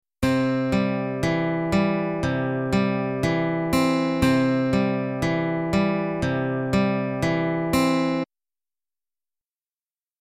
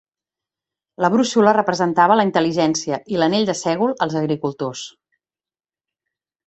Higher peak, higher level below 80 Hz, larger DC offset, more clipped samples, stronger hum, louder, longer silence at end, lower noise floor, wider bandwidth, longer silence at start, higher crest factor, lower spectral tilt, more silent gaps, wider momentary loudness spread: second, -8 dBFS vs -2 dBFS; first, -44 dBFS vs -62 dBFS; neither; neither; neither; second, -23 LUFS vs -18 LUFS; first, 1.95 s vs 1.55 s; about the same, under -90 dBFS vs under -90 dBFS; first, 16 kHz vs 8.2 kHz; second, 0.2 s vs 1 s; about the same, 14 dB vs 18 dB; first, -6.5 dB/octave vs -5 dB/octave; neither; second, 4 LU vs 10 LU